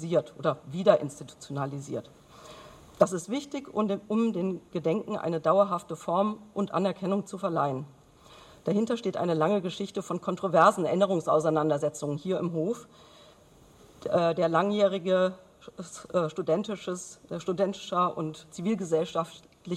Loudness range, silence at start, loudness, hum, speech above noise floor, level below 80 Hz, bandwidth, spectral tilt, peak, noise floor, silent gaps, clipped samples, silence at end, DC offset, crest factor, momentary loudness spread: 5 LU; 0 s; -28 LUFS; none; 28 dB; -68 dBFS; 13 kHz; -6 dB/octave; -6 dBFS; -56 dBFS; none; under 0.1%; 0 s; under 0.1%; 22 dB; 14 LU